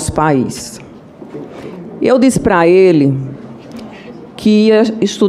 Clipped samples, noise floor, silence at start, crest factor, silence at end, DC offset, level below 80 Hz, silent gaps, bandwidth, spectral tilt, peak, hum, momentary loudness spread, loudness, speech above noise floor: under 0.1%; -34 dBFS; 0 s; 12 dB; 0 s; under 0.1%; -40 dBFS; none; 15 kHz; -6 dB/octave; 0 dBFS; none; 23 LU; -11 LUFS; 24 dB